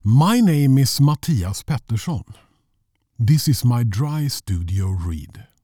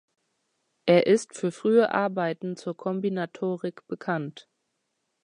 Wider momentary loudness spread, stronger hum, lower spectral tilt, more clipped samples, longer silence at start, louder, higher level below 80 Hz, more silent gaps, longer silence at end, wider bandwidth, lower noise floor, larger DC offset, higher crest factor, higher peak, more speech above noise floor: about the same, 11 LU vs 12 LU; neither; about the same, -6 dB/octave vs -6 dB/octave; neither; second, 0.05 s vs 0.85 s; first, -19 LUFS vs -26 LUFS; first, -40 dBFS vs -78 dBFS; neither; second, 0.2 s vs 0.85 s; first, 19 kHz vs 10.5 kHz; second, -68 dBFS vs -78 dBFS; first, 0.2% vs under 0.1%; second, 12 dB vs 20 dB; about the same, -6 dBFS vs -8 dBFS; about the same, 50 dB vs 53 dB